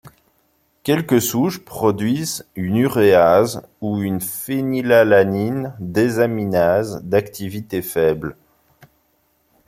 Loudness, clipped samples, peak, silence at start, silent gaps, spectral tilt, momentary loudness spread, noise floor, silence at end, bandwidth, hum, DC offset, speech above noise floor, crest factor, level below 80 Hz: -18 LUFS; under 0.1%; -2 dBFS; 0.05 s; none; -5.5 dB/octave; 13 LU; -63 dBFS; 1.35 s; 16.5 kHz; none; under 0.1%; 45 dB; 16 dB; -54 dBFS